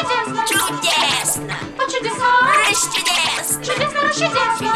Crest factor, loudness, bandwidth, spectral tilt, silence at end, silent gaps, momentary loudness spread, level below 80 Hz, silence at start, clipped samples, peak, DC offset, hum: 14 dB; -16 LUFS; 16.5 kHz; -1.5 dB/octave; 0 s; none; 7 LU; -50 dBFS; 0 s; under 0.1%; -4 dBFS; under 0.1%; none